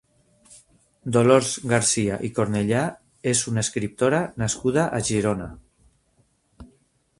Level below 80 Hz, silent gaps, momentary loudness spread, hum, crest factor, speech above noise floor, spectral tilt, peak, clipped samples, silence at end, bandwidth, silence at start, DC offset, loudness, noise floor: -52 dBFS; none; 9 LU; none; 22 dB; 43 dB; -4.5 dB/octave; -2 dBFS; under 0.1%; 0.55 s; 11.5 kHz; 1.05 s; under 0.1%; -22 LUFS; -65 dBFS